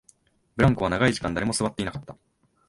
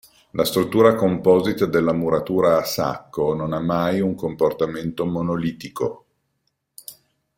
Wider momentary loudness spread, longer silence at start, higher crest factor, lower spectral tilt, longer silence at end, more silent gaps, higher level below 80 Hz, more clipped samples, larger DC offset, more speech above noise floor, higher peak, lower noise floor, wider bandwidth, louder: about the same, 13 LU vs 11 LU; first, 0.55 s vs 0.35 s; about the same, 20 dB vs 20 dB; about the same, -5.5 dB/octave vs -6 dB/octave; about the same, 0.55 s vs 0.45 s; neither; first, -44 dBFS vs -54 dBFS; neither; neither; second, 37 dB vs 53 dB; second, -6 dBFS vs -2 dBFS; second, -61 dBFS vs -73 dBFS; second, 11.5 kHz vs 16.5 kHz; second, -24 LUFS vs -21 LUFS